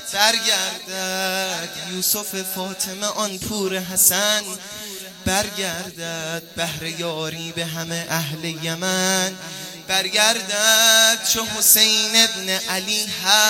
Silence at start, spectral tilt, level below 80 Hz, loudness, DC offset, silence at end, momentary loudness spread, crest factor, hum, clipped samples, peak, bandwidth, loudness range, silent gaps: 0 s; -1 dB/octave; -56 dBFS; -19 LUFS; under 0.1%; 0 s; 14 LU; 22 dB; none; under 0.1%; 0 dBFS; 17 kHz; 10 LU; none